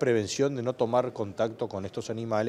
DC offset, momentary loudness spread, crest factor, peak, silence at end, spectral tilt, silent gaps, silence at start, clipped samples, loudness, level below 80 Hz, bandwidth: under 0.1%; 8 LU; 16 dB; -12 dBFS; 0 s; -5.5 dB/octave; none; 0 s; under 0.1%; -29 LUFS; -66 dBFS; 13 kHz